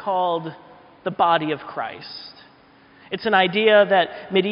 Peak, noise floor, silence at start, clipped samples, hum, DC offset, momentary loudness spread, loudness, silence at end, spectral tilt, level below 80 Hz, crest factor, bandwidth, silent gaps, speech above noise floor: -4 dBFS; -52 dBFS; 0 s; under 0.1%; none; under 0.1%; 20 LU; -20 LUFS; 0 s; -2 dB/octave; -66 dBFS; 18 dB; 5.4 kHz; none; 31 dB